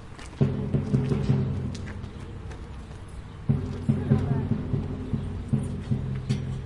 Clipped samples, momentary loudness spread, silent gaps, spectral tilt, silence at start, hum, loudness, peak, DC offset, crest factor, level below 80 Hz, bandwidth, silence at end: under 0.1%; 15 LU; none; -8.5 dB/octave; 0 s; none; -28 LUFS; -8 dBFS; under 0.1%; 20 dB; -42 dBFS; 10.5 kHz; 0 s